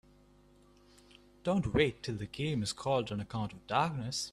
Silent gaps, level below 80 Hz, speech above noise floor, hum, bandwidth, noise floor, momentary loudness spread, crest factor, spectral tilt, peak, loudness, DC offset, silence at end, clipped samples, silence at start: none; -56 dBFS; 29 dB; 50 Hz at -55 dBFS; 13.5 kHz; -62 dBFS; 9 LU; 22 dB; -5 dB/octave; -14 dBFS; -34 LUFS; under 0.1%; 0 s; under 0.1%; 1.45 s